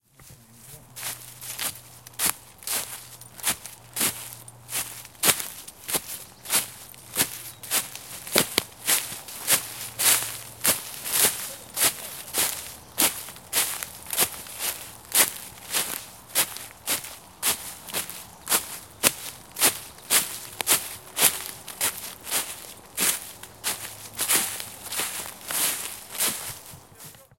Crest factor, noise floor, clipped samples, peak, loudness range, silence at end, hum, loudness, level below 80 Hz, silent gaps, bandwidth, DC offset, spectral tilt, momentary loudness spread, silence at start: 28 dB; -51 dBFS; under 0.1%; 0 dBFS; 5 LU; 0.15 s; none; -25 LUFS; -62 dBFS; none; 17 kHz; under 0.1%; 0 dB/octave; 15 LU; 0.2 s